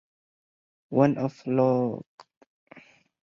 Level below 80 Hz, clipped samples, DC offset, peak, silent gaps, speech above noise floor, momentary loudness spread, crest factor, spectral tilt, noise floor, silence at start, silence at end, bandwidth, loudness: -68 dBFS; under 0.1%; under 0.1%; -8 dBFS; 2.07-2.18 s, 2.37-2.41 s, 2.47-2.67 s; 30 dB; 8 LU; 20 dB; -9.5 dB/octave; -54 dBFS; 0.9 s; 0.45 s; 7.2 kHz; -25 LUFS